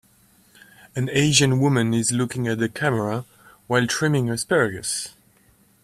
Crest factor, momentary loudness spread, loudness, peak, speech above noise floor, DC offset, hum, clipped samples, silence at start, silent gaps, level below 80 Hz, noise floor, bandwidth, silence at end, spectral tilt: 22 dB; 11 LU; -21 LUFS; -2 dBFS; 37 dB; under 0.1%; none; under 0.1%; 0.95 s; none; -56 dBFS; -58 dBFS; 14.5 kHz; 0.75 s; -4.5 dB/octave